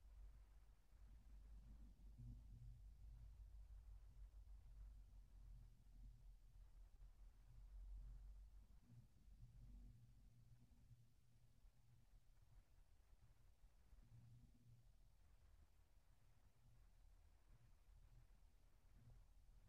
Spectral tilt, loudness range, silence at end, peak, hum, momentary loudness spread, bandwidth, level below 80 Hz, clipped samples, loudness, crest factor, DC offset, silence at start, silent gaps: -7.5 dB/octave; 3 LU; 0 s; -50 dBFS; none; 6 LU; 7.6 kHz; -66 dBFS; under 0.1%; -66 LUFS; 16 dB; under 0.1%; 0 s; none